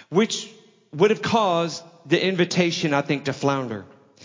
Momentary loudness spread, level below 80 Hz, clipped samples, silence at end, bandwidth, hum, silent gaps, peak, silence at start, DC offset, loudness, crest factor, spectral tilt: 14 LU; -64 dBFS; under 0.1%; 0.4 s; 7.6 kHz; none; none; -4 dBFS; 0.1 s; under 0.1%; -22 LUFS; 18 dB; -5 dB/octave